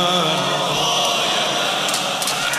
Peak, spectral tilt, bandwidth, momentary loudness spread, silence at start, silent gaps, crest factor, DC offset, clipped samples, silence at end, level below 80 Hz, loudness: -4 dBFS; -2 dB/octave; 15.5 kHz; 2 LU; 0 s; none; 16 dB; under 0.1%; under 0.1%; 0 s; -58 dBFS; -18 LUFS